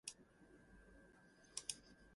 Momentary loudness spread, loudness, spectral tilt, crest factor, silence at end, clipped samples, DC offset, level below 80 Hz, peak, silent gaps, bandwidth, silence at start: 19 LU; -51 LUFS; -0.5 dB/octave; 32 dB; 0 s; under 0.1%; under 0.1%; -74 dBFS; -26 dBFS; none; 11.5 kHz; 0.05 s